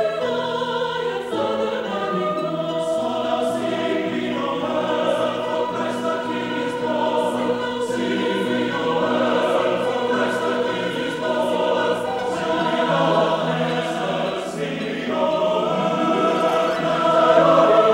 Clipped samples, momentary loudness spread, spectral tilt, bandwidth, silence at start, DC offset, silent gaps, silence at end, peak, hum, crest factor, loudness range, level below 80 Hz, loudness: under 0.1%; 6 LU; -5.5 dB/octave; 16 kHz; 0 s; under 0.1%; none; 0 s; -4 dBFS; none; 16 dB; 2 LU; -58 dBFS; -21 LUFS